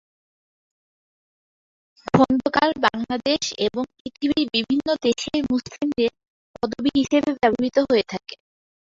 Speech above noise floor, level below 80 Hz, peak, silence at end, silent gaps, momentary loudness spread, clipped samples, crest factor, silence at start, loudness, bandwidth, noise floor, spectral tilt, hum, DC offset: over 69 dB; -54 dBFS; -2 dBFS; 0.5 s; 4.00-4.05 s, 6.30-6.54 s; 10 LU; under 0.1%; 20 dB; 2.15 s; -22 LUFS; 7.8 kHz; under -90 dBFS; -4.5 dB/octave; none; under 0.1%